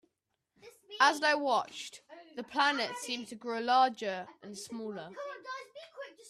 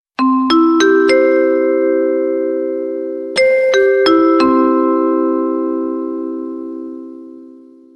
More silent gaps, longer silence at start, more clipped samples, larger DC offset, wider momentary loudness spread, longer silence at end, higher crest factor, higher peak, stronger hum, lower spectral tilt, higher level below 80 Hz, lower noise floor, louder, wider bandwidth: neither; first, 0.65 s vs 0.2 s; neither; neither; first, 20 LU vs 14 LU; second, 0 s vs 0.45 s; first, 22 dB vs 12 dB; second, -12 dBFS vs -2 dBFS; neither; second, -2 dB/octave vs -3.5 dB/octave; second, -84 dBFS vs -58 dBFS; first, -83 dBFS vs -40 dBFS; second, -31 LUFS vs -13 LUFS; first, 14 kHz vs 8.8 kHz